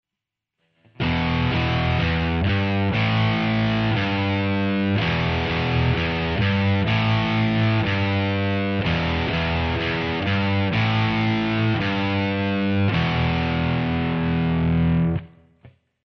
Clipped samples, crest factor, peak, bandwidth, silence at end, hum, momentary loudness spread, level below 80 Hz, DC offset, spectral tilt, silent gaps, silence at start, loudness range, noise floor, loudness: under 0.1%; 12 dB; -10 dBFS; 6.4 kHz; 0.35 s; none; 3 LU; -38 dBFS; under 0.1%; -8 dB/octave; none; 1 s; 1 LU; -86 dBFS; -22 LUFS